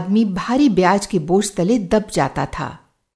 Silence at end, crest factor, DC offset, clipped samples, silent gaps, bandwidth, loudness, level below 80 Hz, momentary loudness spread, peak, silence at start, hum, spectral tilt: 0.4 s; 16 dB; under 0.1%; under 0.1%; none; 11 kHz; -18 LUFS; -44 dBFS; 10 LU; -2 dBFS; 0 s; none; -5.5 dB/octave